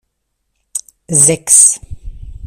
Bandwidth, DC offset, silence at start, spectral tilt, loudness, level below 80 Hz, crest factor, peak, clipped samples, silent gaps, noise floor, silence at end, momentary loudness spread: over 20 kHz; under 0.1%; 0.75 s; -2.5 dB/octave; -7 LUFS; -36 dBFS; 14 dB; 0 dBFS; 0.6%; none; -69 dBFS; 0 s; 19 LU